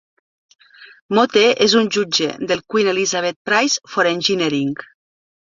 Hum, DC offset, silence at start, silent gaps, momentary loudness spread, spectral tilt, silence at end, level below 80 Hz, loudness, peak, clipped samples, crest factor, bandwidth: none; under 0.1%; 0.8 s; 1.01-1.09 s, 3.36-3.45 s; 8 LU; -3 dB/octave; 0.75 s; -62 dBFS; -17 LUFS; 0 dBFS; under 0.1%; 18 dB; 7.6 kHz